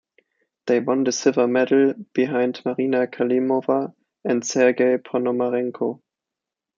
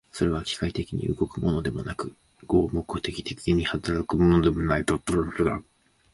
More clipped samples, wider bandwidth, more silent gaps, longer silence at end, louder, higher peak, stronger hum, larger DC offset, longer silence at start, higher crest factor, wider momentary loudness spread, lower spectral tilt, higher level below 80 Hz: neither; second, 7.6 kHz vs 11.5 kHz; neither; first, 0.85 s vs 0.55 s; first, -21 LUFS vs -26 LUFS; first, -4 dBFS vs -8 dBFS; neither; neither; first, 0.65 s vs 0.15 s; about the same, 18 dB vs 18 dB; about the same, 9 LU vs 10 LU; second, -5 dB/octave vs -6.5 dB/octave; second, -74 dBFS vs -40 dBFS